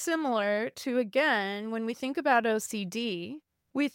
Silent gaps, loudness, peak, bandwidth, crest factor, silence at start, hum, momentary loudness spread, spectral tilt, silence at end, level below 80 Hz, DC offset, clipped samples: none; -29 LUFS; -12 dBFS; 17 kHz; 18 dB; 0 s; none; 10 LU; -3.5 dB/octave; 0.05 s; -80 dBFS; under 0.1%; under 0.1%